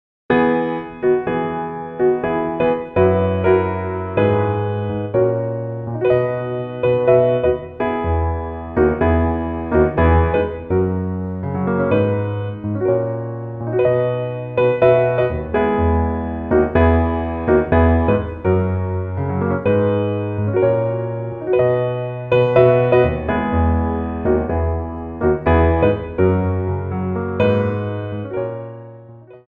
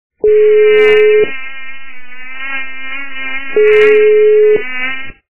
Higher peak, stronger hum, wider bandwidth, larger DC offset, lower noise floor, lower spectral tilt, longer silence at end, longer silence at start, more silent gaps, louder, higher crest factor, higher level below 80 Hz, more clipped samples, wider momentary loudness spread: about the same, -2 dBFS vs 0 dBFS; neither; about the same, 4.3 kHz vs 4 kHz; second, under 0.1% vs 10%; first, -40 dBFS vs -32 dBFS; first, -11 dB/octave vs -7 dB/octave; about the same, 0.1 s vs 0 s; first, 0.3 s vs 0.1 s; neither; second, -18 LUFS vs -10 LUFS; about the same, 16 dB vs 12 dB; first, -30 dBFS vs -50 dBFS; second, under 0.1% vs 0.1%; second, 10 LU vs 19 LU